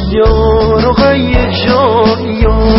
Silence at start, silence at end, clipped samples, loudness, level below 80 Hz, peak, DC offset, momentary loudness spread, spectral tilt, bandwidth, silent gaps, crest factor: 0 s; 0 s; under 0.1%; -10 LUFS; -16 dBFS; 0 dBFS; under 0.1%; 3 LU; -10 dB/octave; 5.8 kHz; none; 8 dB